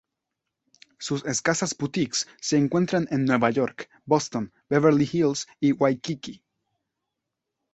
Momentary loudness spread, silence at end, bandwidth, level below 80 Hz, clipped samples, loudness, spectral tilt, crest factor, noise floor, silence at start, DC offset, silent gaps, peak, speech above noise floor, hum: 10 LU; 1.4 s; 8.2 kHz; -64 dBFS; under 0.1%; -24 LUFS; -5 dB/octave; 20 dB; -84 dBFS; 1 s; under 0.1%; none; -6 dBFS; 60 dB; none